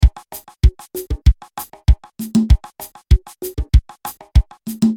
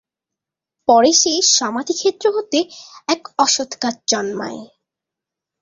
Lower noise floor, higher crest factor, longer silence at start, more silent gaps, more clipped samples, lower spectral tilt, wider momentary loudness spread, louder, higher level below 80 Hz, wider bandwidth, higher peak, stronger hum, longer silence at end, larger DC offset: second, -37 dBFS vs -85 dBFS; about the same, 16 dB vs 18 dB; second, 0 s vs 0.9 s; neither; neither; first, -7 dB/octave vs -1 dB/octave; about the same, 14 LU vs 15 LU; second, -19 LUFS vs -16 LUFS; first, -18 dBFS vs -64 dBFS; first, 18.5 kHz vs 7.8 kHz; about the same, 0 dBFS vs -2 dBFS; neither; second, 0 s vs 0.95 s; neither